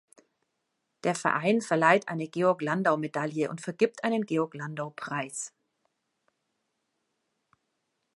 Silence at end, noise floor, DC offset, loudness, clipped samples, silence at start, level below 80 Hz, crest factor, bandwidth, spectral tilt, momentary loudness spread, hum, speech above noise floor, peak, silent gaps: 2.65 s; -80 dBFS; under 0.1%; -28 LUFS; under 0.1%; 1.05 s; -80 dBFS; 24 dB; 11.5 kHz; -5 dB/octave; 13 LU; none; 52 dB; -6 dBFS; none